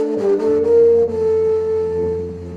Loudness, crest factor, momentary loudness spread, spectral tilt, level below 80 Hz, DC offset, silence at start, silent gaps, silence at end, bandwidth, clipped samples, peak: -16 LUFS; 10 dB; 9 LU; -8.5 dB/octave; -46 dBFS; 0.1%; 0 s; none; 0 s; 6.4 kHz; under 0.1%; -6 dBFS